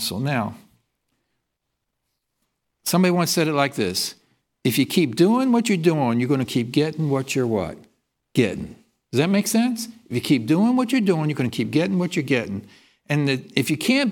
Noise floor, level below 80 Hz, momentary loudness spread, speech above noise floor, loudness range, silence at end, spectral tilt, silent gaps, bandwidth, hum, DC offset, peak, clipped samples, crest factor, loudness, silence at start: -78 dBFS; -62 dBFS; 8 LU; 58 dB; 4 LU; 0 s; -5 dB/octave; none; 18 kHz; none; under 0.1%; -2 dBFS; under 0.1%; 20 dB; -21 LUFS; 0 s